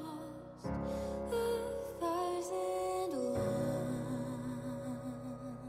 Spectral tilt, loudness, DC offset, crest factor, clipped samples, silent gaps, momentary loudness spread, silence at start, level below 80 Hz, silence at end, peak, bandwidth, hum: -6.5 dB/octave; -38 LUFS; under 0.1%; 14 dB; under 0.1%; none; 9 LU; 0 s; -58 dBFS; 0 s; -24 dBFS; 16 kHz; none